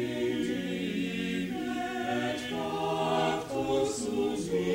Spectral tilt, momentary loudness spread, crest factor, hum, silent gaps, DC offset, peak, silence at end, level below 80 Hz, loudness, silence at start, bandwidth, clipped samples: -5 dB/octave; 4 LU; 14 dB; none; none; under 0.1%; -16 dBFS; 0 s; -58 dBFS; -31 LUFS; 0 s; 17 kHz; under 0.1%